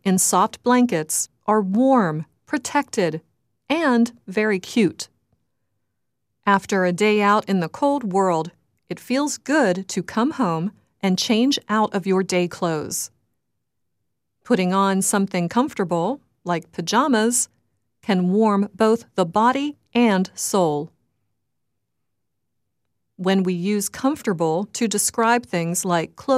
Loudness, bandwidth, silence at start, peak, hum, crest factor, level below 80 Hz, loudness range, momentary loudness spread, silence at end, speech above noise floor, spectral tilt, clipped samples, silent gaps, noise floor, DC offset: -21 LUFS; 15.5 kHz; 0.05 s; -2 dBFS; none; 20 dB; -66 dBFS; 4 LU; 9 LU; 0 s; 60 dB; -4.5 dB/octave; under 0.1%; none; -80 dBFS; under 0.1%